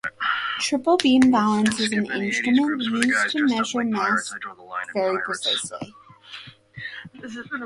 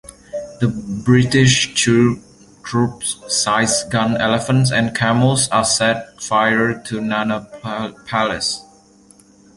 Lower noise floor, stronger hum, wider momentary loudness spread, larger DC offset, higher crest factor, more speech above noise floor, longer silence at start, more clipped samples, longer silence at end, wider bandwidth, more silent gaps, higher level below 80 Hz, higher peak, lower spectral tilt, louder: second, -43 dBFS vs -49 dBFS; neither; first, 19 LU vs 12 LU; neither; first, 22 dB vs 16 dB; second, 21 dB vs 32 dB; about the same, 0.05 s vs 0.05 s; neither; second, 0 s vs 0.95 s; about the same, 11.5 kHz vs 11.5 kHz; neither; second, -62 dBFS vs -48 dBFS; about the same, 0 dBFS vs -2 dBFS; about the same, -3.5 dB/octave vs -4 dB/octave; second, -22 LUFS vs -17 LUFS